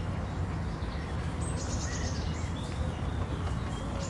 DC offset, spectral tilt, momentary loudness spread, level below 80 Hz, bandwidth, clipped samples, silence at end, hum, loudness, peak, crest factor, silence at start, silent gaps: under 0.1%; -5.5 dB/octave; 2 LU; -40 dBFS; 11.5 kHz; under 0.1%; 0 s; none; -34 LUFS; -20 dBFS; 12 dB; 0 s; none